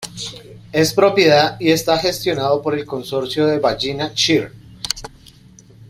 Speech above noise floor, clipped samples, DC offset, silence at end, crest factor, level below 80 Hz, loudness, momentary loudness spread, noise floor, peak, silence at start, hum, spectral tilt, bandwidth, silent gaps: 29 dB; under 0.1%; under 0.1%; 0 s; 18 dB; -48 dBFS; -17 LUFS; 16 LU; -45 dBFS; 0 dBFS; 0 s; none; -4 dB/octave; 16 kHz; none